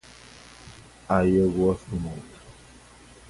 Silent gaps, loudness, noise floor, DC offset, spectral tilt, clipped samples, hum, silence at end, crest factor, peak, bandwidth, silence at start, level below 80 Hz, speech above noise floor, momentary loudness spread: none; -24 LUFS; -50 dBFS; under 0.1%; -7.5 dB/octave; under 0.1%; none; 0.8 s; 22 dB; -6 dBFS; 11.5 kHz; 0.65 s; -46 dBFS; 27 dB; 25 LU